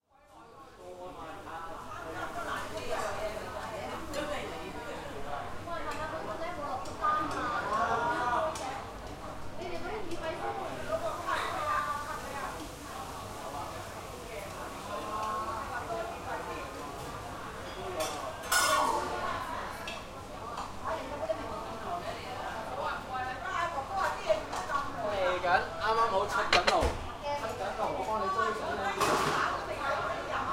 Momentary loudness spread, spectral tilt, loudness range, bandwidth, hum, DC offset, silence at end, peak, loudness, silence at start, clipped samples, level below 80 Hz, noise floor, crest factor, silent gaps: 13 LU; -3 dB/octave; 8 LU; 16 kHz; none; under 0.1%; 0 s; -8 dBFS; -34 LUFS; 0.3 s; under 0.1%; -50 dBFS; -56 dBFS; 26 dB; none